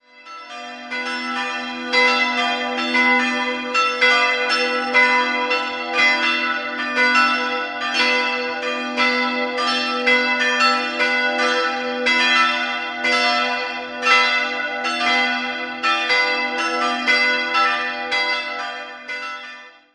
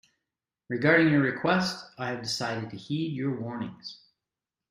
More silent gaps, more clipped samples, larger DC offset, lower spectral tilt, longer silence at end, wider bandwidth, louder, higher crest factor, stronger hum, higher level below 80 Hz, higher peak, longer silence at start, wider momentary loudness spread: neither; neither; neither; second, -1 dB/octave vs -5.5 dB/octave; second, 0.25 s vs 0.75 s; second, 11.5 kHz vs 15.5 kHz; first, -18 LUFS vs -27 LUFS; about the same, 18 dB vs 22 dB; neither; about the same, -66 dBFS vs -68 dBFS; first, -2 dBFS vs -8 dBFS; second, 0.15 s vs 0.7 s; second, 11 LU vs 15 LU